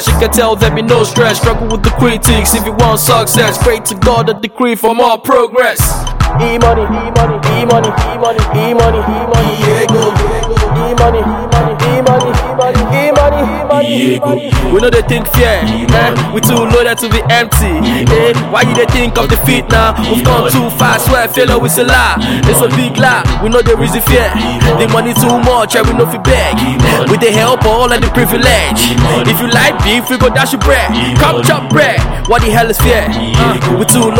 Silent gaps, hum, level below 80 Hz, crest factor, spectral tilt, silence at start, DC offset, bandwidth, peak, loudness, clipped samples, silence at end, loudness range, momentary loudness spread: none; none; -18 dBFS; 10 dB; -4.5 dB/octave; 0 s; under 0.1%; 18 kHz; 0 dBFS; -9 LUFS; 0.1%; 0 s; 2 LU; 4 LU